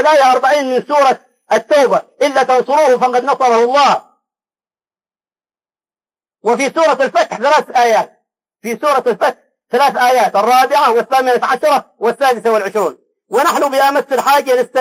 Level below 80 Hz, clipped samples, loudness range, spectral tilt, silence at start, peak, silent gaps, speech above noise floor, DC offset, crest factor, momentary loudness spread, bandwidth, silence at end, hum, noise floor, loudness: -68 dBFS; under 0.1%; 5 LU; -3 dB/octave; 0 s; -2 dBFS; none; over 78 dB; under 0.1%; 12 dB; 7 LU; 16 kHz; 0 s; none; under -90 dBFS; -13 LUFS